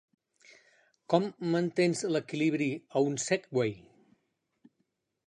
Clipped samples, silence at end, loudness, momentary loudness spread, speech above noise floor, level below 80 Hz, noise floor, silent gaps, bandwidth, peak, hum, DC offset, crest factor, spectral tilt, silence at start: under 0.1%; 1.5 s; -30 LUFS; 4 LU; 50 dB; -76 dBFS; -79 dBFS; none; 11 kHz; -10 dBFS; none; under 0.1%; 22 dB; -5 dB/octave; 1.1 s